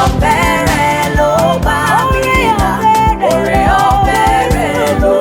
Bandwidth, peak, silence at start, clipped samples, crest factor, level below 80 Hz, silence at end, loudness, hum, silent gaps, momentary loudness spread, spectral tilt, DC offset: 17.5 kHz; 0 dBFS; 0 s; under 0.1%; 10 dB; -22 dBFS; 0 s; -11 LUFS; none; none; 2 LU; -5 dB/octave; under 0.1%